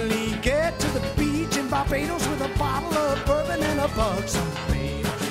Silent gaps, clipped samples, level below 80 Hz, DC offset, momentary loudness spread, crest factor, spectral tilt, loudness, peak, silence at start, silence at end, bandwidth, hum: none; under 0.1%; -34 dBFS; under 0.1%; 3 LU; 16 dB; -5 dB/octave; -25 LUFS; -8 dBFS; 0 s; 0 s; 16 kHz; none